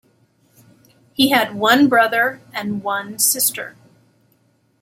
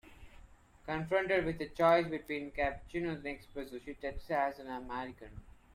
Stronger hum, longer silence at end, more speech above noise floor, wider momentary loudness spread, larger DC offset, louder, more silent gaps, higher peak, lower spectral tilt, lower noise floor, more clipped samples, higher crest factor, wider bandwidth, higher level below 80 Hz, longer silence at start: neither; first, 1.1 s vs 0.2 s; first, 43 dB vs 23 dB; about the same, 15 LU vs 16 LU; neither; first, -16 LUFS vs -35 LUFS; neither; first, -2 dBFS vs -16 dBFS; second, -2 dB/octave vs -6.5 dB/octave; about the same, -61 dBFS vs -58 dBFS; neither; about the same, 18 dB vs 20 dB; about the same, 16.5 kHz vs 15.5 kHz; second, -66 dBFS vs -54 dBFS; first, 1.2 s vs 0.05 s